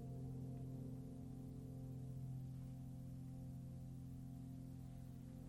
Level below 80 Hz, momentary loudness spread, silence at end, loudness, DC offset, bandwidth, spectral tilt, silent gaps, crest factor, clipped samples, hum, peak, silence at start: -64 dBFS; 3 LU; 0 s; -53 LUFS; under 0.1%; 15 kHz; -9 dB/octave; none; 10 dB; under 0.1%; none; -40 dBFS; 0 s